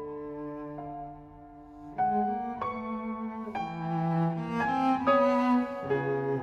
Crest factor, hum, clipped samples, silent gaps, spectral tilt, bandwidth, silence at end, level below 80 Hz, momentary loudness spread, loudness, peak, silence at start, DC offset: 20 dB; none; under 0.1%; none; -8.5 dB/octave; 8 kHz; 0 s; -60 dBFS; 18 LU; -30 LUFS; -10 dBFS; 0 s; under 0.1%